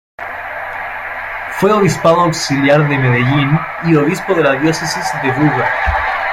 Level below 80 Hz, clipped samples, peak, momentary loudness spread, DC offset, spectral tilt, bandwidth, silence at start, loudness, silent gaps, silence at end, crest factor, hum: -34 dBFS; under 0.1%; -2 dBFS; 11 LU; under 0.1%; -5.5 dB/octave; 16 kHz; 0.2 s; -14 LUFS; none; 0 s; 12 dB; none